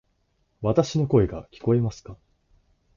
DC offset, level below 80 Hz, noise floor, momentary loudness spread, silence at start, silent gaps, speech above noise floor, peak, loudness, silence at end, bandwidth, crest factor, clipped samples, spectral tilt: under 0.1%; -46 dBFS; -69 dBFS; 9 LU; 0.6 s; none; 46 dB; -6 dBFS; -24 LUFS; 0.8 s; 7.4 kHz; 20 dB; under 0.1%; -8 dB/octave